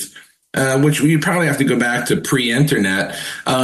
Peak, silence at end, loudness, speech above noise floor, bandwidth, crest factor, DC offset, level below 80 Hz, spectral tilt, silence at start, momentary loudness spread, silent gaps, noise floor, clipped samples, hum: -2 dBFS; 0 s; -16 LUFS; 25 dB; 13 kHz; 14 dB; under 0.1%; -52 dBFS; -5 dB/octave; 0 s; 8 LU; none; -41 dBFS; under 0.1%; none